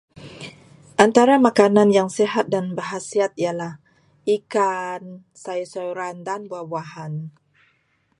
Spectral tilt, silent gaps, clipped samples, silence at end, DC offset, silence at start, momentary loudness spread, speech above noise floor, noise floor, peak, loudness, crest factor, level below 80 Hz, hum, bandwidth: -5.5 dB/octave; none; under 0.1%; 0.9 s; under 0.1%; 0.2 s; 20 LU; 45 dB; -65 dBFS; 0 dBFS; -20 LUFS; 22 dB; -66 dBFS; none; 11.5 kHz